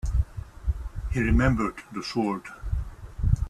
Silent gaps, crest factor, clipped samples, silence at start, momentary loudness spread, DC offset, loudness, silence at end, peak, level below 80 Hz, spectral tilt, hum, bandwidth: none; 18 dB; under 0.1%; 0.05 s; 12 LU; under 0.1%; -28 LUFS; 0 s; -8 dBFS; -30 dBFS; -7 dB/octave; none; 12 kHz